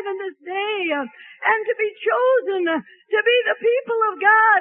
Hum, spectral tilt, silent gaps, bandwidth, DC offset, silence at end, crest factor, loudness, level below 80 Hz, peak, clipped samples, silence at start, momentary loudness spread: none; -7 dB/octave; none; 3.7 kHz; under 0.1%; 0 s; 16 dB; -20 LUFS; -78 dBFS; -4 dBFS; under 0.1%; 0 s; 11 LU